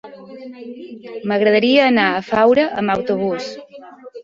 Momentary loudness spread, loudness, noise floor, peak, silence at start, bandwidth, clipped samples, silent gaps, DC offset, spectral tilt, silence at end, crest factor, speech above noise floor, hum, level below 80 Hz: 23 LU; -16 LUFS; -37 dBFS; -2 dBFS; 0.05 s; 7.6 kHz; under 0.1%; none; under 0.1%; -6 dB/octave; 0 s; 16 dB; 21 dB; none; -58 dBFS